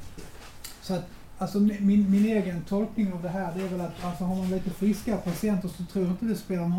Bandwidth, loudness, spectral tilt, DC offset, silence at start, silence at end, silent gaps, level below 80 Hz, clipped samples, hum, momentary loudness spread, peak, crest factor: 16.5 kHz; -28 LUFS; -7.5 dB/octave; under 0.1%; 0 s; 0 s; none; -50 dBFS; under 0.1%; none; 16 LU; -14 dBFS; 14 dB